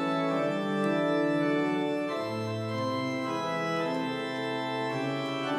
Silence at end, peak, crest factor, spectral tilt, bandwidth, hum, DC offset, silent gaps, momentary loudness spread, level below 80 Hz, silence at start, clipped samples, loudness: 0 s; -18 dBFS; 12 dB; -6 dB/octave; 14 kHz; none; under 0.1%; none; 5 LU; -74 dBFS; 0 s; under 0.1%; -30 LUFS